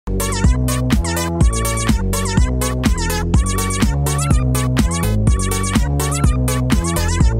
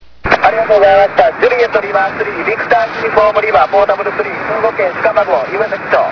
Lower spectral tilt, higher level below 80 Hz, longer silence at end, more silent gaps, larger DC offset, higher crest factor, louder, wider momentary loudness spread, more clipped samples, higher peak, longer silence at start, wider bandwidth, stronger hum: about the same, -5 dB/octave vs -5.5 dB/octave; first, -20 dBFS vs -42 dBFS; about the same, 0 s vs 0 s; neither; neither; about the same, 14 dB vs 12 dB; second, -17 LUFS vs -12 LUFS; second, 2 LU vs 7 LU; second, under 0.1% vs 0.3%; about the same, -2 dBFS vs 0 dBFS; second, 0.05 s vs 0.25 s; first, 16.5 kHz vs 5.4 kHz; neither